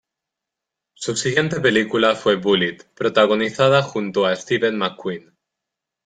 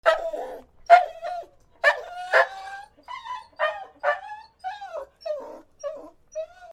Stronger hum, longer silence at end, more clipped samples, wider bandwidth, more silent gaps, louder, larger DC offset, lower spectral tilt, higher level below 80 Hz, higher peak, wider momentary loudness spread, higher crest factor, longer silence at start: neither; first, 0.85 s vs 0 s; neither; second, 9.4 kHz vs 12 kHz; neither; first, -19 LUFS vs -24 LUFS; neither; first, -4.5 dB/octave vs -1 dB/octave; about the same, -60 dBFS vs -62 dBFS; about the same, -2 dBFS vs -2 dBFS; second, 9 LU vs 21 LU; second, 18 dB vs 26 dB; first, 1 s vs 0.05 s